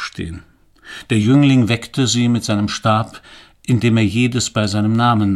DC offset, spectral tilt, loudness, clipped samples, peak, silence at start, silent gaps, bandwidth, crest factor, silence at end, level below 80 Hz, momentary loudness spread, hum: under 0.1%; -5.5 dB/octave; -16 LUFS; under 0.1%; -2 dBFS; 0 s; none; 12.5 kHz; 16 dB; 0 s; -46 dBFS; 17 LU; none